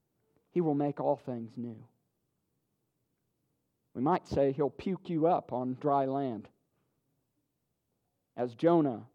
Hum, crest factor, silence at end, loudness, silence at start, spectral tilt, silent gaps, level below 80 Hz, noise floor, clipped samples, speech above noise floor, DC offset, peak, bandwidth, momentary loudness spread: none; 20 dB; 0.1 s; -31 LUFS; 0.55 s; -9 dB/octave; none; -66 dBFS; -82 dBFS; under 0.1%; 51 dB; under 0.1%; -14 dBFS; 8 kHz; 14 LU